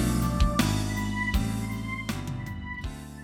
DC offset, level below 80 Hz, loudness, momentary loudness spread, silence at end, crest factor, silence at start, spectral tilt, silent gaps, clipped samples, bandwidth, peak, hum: under 0.1%; -34 dBFS; -29 LUFS; 11 LU; 0 s; 16 dB; 0 s; -5 dB/octave; none; under 0.1%; 18.5 kHz; -12 dBFS; none